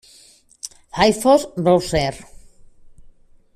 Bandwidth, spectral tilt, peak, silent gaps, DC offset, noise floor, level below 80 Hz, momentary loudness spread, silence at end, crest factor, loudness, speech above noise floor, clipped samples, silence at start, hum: 14.5 kHz; -5 dB/octave; -2 dBFS; none; under 0.1%; -51 dBFS; -44 dBFS; 19 LU; 1.35 s; 18 dB; -18 LUFS; 34 dB; under 0.1%; 0.65 s; none